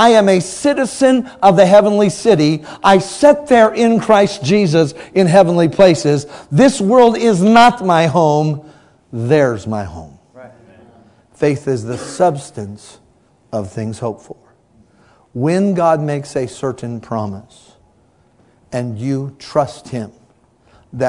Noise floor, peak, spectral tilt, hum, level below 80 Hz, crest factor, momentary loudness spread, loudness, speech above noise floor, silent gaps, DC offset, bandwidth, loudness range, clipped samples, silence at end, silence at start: -53 dBFS; 0 dBFS; -6 dB/octave; none; -50 dBFS; 14 dB; 17 LU; -13 LUFS; 40 dB; none; under 0.1%; 12 kHz; 12 LU; 0.4%; 0 s; 0 s